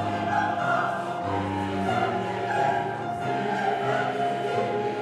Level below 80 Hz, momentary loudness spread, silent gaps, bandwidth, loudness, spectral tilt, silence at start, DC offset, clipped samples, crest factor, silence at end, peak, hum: -62 dBFS; 4 LU; none; 12.5 kHz; -26 LUFS; -6 dB/octave; 0 s; under 0.1%; under 0.1%; 12 dB; 0 s; -14 dBFS; none